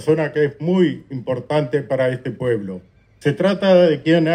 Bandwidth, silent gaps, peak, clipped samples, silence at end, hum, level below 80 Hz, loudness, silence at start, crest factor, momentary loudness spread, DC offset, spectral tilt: 10 kHz; none; -4 dBFS; under 0.1%; 0 s; none; -58 dBFS; -19 LUFS; 0 s; 14 dB; 12 LU; under 0.1%; -7.5 dB/octave